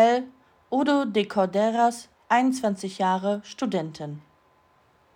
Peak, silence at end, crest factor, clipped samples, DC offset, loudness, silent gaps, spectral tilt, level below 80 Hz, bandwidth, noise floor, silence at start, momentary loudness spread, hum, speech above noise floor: -8 dBFS; 0.95 s; 18 dB; under 0.1%; under 0.1%; -25 LUFS; none; -5.5 dB/octave; -72 dBFS; 16 kHz; -62 dBFS; 0 s; 16 LU; none; 37 dB